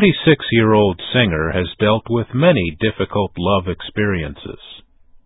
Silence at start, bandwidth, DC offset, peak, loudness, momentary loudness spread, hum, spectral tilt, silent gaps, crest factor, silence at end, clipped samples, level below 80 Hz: 0 s; 4 kHz; under 0.1%; 0 dBFS; -17 LUFS; 10 LU; none; -12 dB/octave; none; 16 dB; 0.5 s; under 0.1%; -36 dBFS